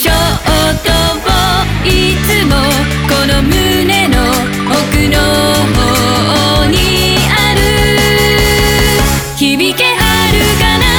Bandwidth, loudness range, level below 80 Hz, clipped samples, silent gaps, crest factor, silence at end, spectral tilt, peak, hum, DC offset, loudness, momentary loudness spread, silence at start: over 20 kHz; 1 LU; -18 dBFS; under 0.1%; none; 10 dB; 0 s; -4 dB/octave; 0 dBFS; none; 0.1%; -9 LUFS; 3 LU; 0 s